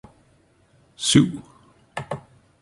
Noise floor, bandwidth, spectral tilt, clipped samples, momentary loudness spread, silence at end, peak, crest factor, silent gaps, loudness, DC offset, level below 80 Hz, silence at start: -59 dBFS; 11.5 kHz; -4.5 dB/octave; under 0.1%; 19 LU; 0.4 s; -2 dBFS; 24 dB; none; -21 LUFS; under 0.1%; -52 dBFS; 1 s